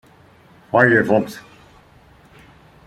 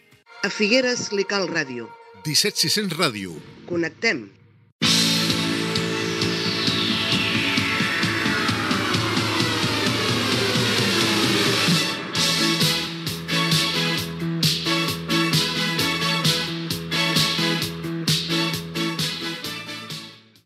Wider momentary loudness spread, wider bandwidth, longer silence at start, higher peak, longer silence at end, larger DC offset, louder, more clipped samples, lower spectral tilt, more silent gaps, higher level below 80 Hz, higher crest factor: first, 18 LU vs 9 LU; about the same, 15.5 kHz vs 16 kHz; first, 0.75 s vs 0.3 s; about the same, -2 dBFS vs -2 dBFS; first, 1.45 s vs 0.3 s; neither; first, -16 LUFS vs -21 LUFS; neither; first, -7 dB/octave vs -3.5 dB/octave; second, none vs 4.72-4.79 s; about the same, -56 dBFS vs -56 dBFS; about the same, 20 dB vs 20 dB